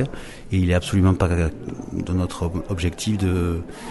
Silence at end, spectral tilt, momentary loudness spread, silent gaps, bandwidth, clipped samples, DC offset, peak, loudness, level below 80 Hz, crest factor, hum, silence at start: 0 s; -6.5 dB/octave; 11 LU; none; 11.5 kHz; under 0.1%; under 0.1%; -6 dBFS; -23 LUFS; -34 dBFS; 16 dB; none; 0 s